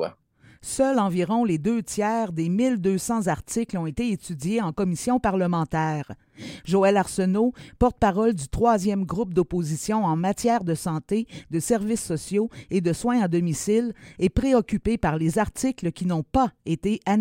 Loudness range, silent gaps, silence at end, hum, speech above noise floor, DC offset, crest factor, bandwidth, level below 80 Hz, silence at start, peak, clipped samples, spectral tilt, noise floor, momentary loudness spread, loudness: 2 LU; none; 0 s; none; 32 dB; under 0.1%; 18 dB; 16.5 kHz; -44 dBFS; 0 s; -6 dBFS; under 0.1%; -6 dB/octave; -55 dBFS; 7 LU; -24 LUFS